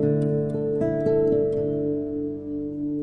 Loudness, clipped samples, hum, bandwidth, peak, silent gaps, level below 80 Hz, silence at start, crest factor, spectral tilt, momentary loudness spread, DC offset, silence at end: -25 LUFS; under 0.1%; none; 4.7 kHz; -12 dBFS; none; -50 dBFS; 0 s; 12 dB; -11 dB/octave; 9 LU; under 0.1%; 0 s